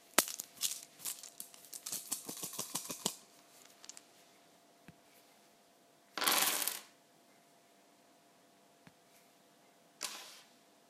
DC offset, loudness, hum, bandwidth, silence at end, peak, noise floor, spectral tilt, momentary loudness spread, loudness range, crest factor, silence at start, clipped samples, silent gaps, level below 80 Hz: under 0.1%; -37 LUFS; none; 16 kHz; 0.45 s; -2 dBFS; -66 dBFS; 0 dB/octave; 25 LU; 14 LU; 40 dB; 0.15 s; under 0.1%; none; -88 dBFS